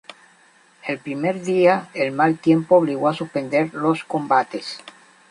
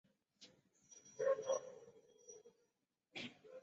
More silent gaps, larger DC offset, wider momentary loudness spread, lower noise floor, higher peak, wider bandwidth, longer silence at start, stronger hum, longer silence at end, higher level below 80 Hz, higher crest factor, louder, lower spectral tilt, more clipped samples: neither; neither; second, 13 LU vs 24 LU; second, -54 dBFS vs -86 dBFS; first, -2 dBFS vs -26 dBFS; first, 11 kHz vs 8 kHz; first, 0.85 s vs 0.4 s; neither; first, 0.4 s vs 0 s; first, -68 dBFS vs under -90 dBFS; about the same, 18 dB vs 22 dB; first, -20 LUFS vs -44 LUFS; first, -6.5 dB/octave vs -2 dB/octave; neither